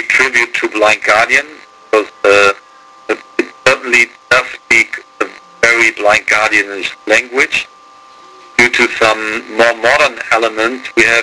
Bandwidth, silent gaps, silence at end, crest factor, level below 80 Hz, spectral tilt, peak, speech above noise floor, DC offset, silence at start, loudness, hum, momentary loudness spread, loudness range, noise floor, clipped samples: 11 kHz; none; 0 s; 12 dB; -48 dBFS; -2 dB/octave; 0 dBFS; 28 dB; under 0.1%; 0 s; -11 LUFS; none; 11 LU; 2 LU; -39 dBFS; 0.3%